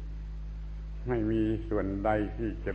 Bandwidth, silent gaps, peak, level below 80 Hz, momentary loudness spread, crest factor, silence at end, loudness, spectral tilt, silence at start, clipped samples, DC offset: 6.4 kHz; none; -14 dBFS; -38 dBFS; 13 LU; 18 dB; 0 s; -33 LUFS; -9.5 dB/octave; 0 s; under 0.1%; under 0.1%